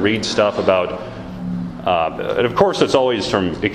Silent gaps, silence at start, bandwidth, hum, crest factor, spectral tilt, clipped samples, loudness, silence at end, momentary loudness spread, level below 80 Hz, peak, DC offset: none; 0 s; 13 kHz; none; 18 dB; -5 dB/octave; under 0.1%; -18 LUFS; 0 s; 11 LU; -44 dBFS; 0 dBFS; under 0.1%